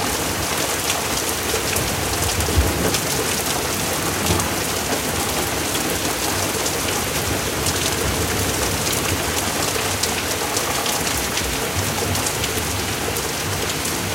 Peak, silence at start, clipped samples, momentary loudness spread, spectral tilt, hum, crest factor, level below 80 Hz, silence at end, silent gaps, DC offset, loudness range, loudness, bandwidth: 0 dBFS; 0 s; under 0.1%; 2 LU; -2.5 dB/octave; none; 22 dB; -34 dBFS; 0 s; none; under 0.1%; 1 LU; -20 LUFS; 17 kHz